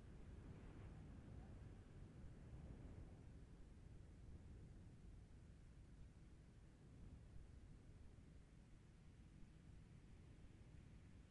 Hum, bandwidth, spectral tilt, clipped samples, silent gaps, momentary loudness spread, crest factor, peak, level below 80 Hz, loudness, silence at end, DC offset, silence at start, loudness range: none; 10.5 kHz; -7 dB/octave; under 0.1%; none; 6 LU; 14 dB; -46 dBFS; -64 dBFS; -64 LUFS; 0 s; under 0.1%; 0 s; 5 LU